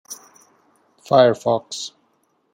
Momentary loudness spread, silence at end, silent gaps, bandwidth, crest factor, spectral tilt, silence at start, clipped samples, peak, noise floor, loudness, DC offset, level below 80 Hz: 22 LU; 0.65 s; none; 16.5 kHz; 20 dB; -4.5 dB/octave; 0.1 s; under 0.1%; -2 dBFS; -65 dBFS; -18 LUFS; under 0.1%; -68 dBFS